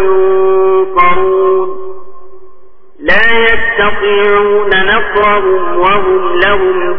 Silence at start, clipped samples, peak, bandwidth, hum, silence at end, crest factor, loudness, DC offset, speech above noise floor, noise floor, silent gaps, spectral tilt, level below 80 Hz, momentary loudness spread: 0 s; 0.2%; 0 dBFS; 5.4 kHz; none; 0 s; 8 dB; -9 LUFS; under 0.1%; 30 dB; -39 dBFS; none; -7 dB/octave; -34 dBFS; 4 LU